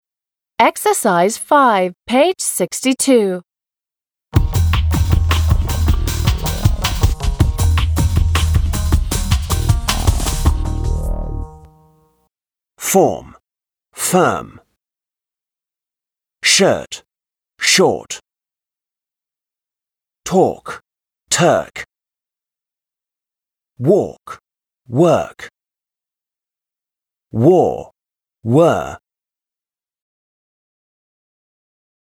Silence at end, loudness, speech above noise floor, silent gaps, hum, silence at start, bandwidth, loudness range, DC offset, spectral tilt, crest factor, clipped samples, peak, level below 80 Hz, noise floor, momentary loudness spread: 3.05 s; -16 LUFS; over 75 dB; none; none; 0.6 s; over 20 kHz; 6 LU; under 0.1%; -4.5 dB/octave; 18 dB; under 0.1%; 0 dBFS; -24 dBFS; under -90 dBFS; 17 LU